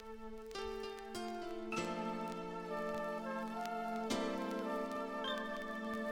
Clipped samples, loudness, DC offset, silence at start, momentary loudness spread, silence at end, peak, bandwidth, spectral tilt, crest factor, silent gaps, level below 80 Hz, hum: under 0.1%; -42 LUFS; under 0.1%; 0 s; 6 LU; 0 s; -24 dBFS; 20 kHz; -4.5 dB/octave; 18 dB; none; -64 dBFS; none